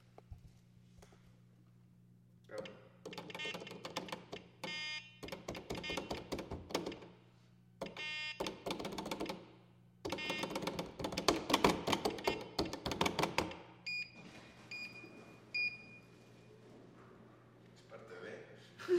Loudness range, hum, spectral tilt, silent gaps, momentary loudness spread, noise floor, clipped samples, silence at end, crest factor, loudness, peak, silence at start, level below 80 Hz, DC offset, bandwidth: 12 LU; none; -3.5 dB/octave; none; 23 LU; -65 dBFS; under 0.1%; 0 s; 32 dB; -41 LUFS; -12 dBFS; 0 s; -64 dBFS; under 0.1%; 16.5 kHz